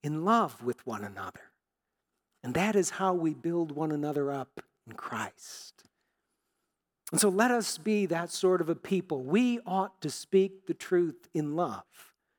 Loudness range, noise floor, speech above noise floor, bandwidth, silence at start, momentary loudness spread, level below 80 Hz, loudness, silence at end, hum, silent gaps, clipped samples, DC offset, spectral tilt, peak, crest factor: 7 LU; -86 dBFS; 56 dB; 19 kHz; 0.05 s; 17 LU; -74 dBFS; -30 LUFS; 0.35 s; none; none; under 0.1%; under 0.1%; -5 dB/octave; -10 dBFS; 20 dB